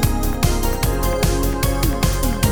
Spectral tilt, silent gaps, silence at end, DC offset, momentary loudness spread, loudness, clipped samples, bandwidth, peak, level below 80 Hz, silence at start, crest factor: -5 dB/octave; none; 0 s; 0.6%; 1 LU; -20 LUFS; under 0.1%; over 20 kHz; -2 dBFS; -20 dBFS; 0 s; 16 dB